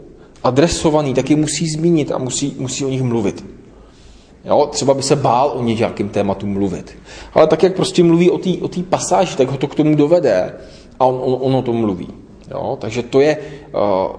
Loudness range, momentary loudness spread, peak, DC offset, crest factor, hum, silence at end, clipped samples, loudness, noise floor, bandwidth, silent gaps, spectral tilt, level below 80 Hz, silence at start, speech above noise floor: 4 LU; 11 LU; 0 dBFS; under 0.1%; 16 dB; none; 0 s; under 0.1%; -16 LUFS; -43 dBFS; 10.5 kHz; none; -5.5 dB/octave; -44 dBFS; 0 s; 27 dB